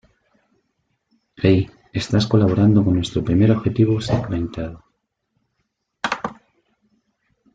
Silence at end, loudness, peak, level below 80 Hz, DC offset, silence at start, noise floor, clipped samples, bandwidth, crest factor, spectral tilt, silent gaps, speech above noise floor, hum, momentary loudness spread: 1.2 s; -19 LUFS; -2 dBFS; -46 dBFS; under 0.1%; 1.4 s; -73 dBFS; under 0.1%; 7.8 kHz; 18 dB; -7.5 dB/octave; none; 56 dB; none; 12 LU